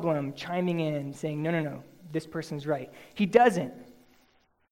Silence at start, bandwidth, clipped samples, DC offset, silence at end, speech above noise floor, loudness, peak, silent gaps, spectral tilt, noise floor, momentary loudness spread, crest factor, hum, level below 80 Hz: 0 s; 16.5 kHz; under 0.1%; under 0.1%; 0.8 s; 39 dB; -29 LUFS; -6 dBFS; none; -6.5 dB/octave; -67 dBFS; 15 LU; 24 dB; none; -68 dBFS